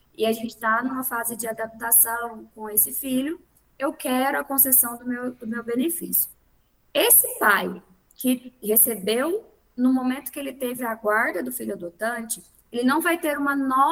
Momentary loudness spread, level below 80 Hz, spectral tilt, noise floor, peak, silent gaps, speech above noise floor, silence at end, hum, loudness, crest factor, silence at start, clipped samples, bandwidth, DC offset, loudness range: 15 LU; -64 dBFS; -2 dB/octave; -63 dBFS; -4 dBFS; none; 39 dB; 0 s; none; -22 LUFS; 20 dB; 0.2 s; under 0.1%; 19.5 kHz; under 0.1%; 5 LU